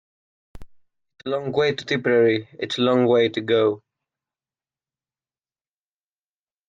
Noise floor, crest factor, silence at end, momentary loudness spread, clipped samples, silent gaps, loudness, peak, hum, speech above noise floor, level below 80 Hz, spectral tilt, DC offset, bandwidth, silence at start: under -90 dBFS; 18 dB; 2.9 s; 11 LU; under 0.1%; none; -21 LUFS; -8 dBFS; none; over 70 dB; -58 dBFS; -6 dB/octave; under 0.1%; 7.8 kHz; 0.55 s